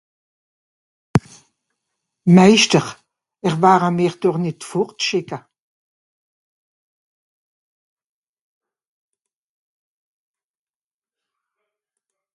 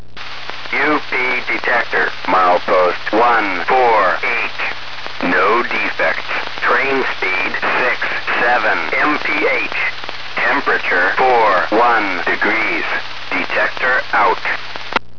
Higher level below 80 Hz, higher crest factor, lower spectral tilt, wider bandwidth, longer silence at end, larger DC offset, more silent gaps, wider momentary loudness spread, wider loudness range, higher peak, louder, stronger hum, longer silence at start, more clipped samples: about the same, -56 dBFS vs -52 dBFS; first, 22 dB vs 16 dB; about the same, -5 dB/octave vs -4 dB/octave; first, 11.5 kHz vs 5.4 kHz; first, 6.95 s vs 0.2 s; second, under 0.1% vs 6%; neither; first, 14 LU vs 8 LU; first, 12 LU vs 2 LU; about the same, 0 dBFS vs 0 dBFS; about the same, -17 LUFS vs -15 LUFS; neither; first, 1.15 s vs 0.15 s; neither